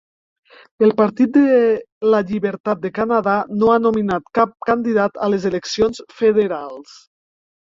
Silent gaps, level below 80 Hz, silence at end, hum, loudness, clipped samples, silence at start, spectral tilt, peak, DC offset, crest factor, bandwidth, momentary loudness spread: 1.92-2.01 s, 2.60-2.64 s; -54 dBFS; 0.85 s; none; -17 LUFS; under 0.1%; 0.8 s; -6.5 dB/octave; -2 dBFS; under 0.1%; 16 dB; 7.6 kHz; 7 LU